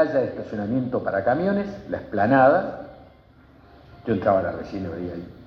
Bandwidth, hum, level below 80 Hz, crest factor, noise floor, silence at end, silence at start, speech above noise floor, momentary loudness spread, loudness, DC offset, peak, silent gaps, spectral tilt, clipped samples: 6.4 kHz; none; -54 dBFS; 18 dB; -52 dBFS; 0 s; 0 s; 29 dB; 16 LU; -23 LUFS; under 0.1%; -6 dBFS; none; -9 dB/octave; under 0.1%